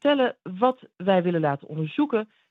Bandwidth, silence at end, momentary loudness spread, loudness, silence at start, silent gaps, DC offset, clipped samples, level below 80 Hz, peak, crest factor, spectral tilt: 4.7 kHz; 0.25 s; 7 LU; -25 LUFS; 0.05 s; none; under 0.1%; under 0.1%; -78 dBFS; -6 dBFS; 18 dB; -9 dB/octave